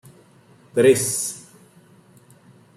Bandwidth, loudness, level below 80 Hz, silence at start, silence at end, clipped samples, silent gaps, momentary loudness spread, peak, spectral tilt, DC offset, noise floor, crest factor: 15.5 kHz; -19 LUFS; -68 dBFS; 0.75 s; 1.35 s; under 0.1%; none; 13 LU; -4 dBFS; -4 dB/octave; under 0.1%; -52 dBFS; 20 dB